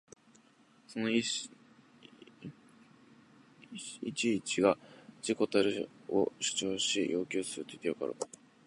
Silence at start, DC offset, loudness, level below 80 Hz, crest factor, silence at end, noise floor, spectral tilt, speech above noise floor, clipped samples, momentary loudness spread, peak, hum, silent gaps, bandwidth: 0.9 s; under 0.1%; -33 LUFS; -74 dBFS; 24 dB; 0.4 s; -64 dBFS; -3 dB/octave; 31 dB; under 0.1%; 16 LU; -12 dBFS; none; none; 11.5 kHz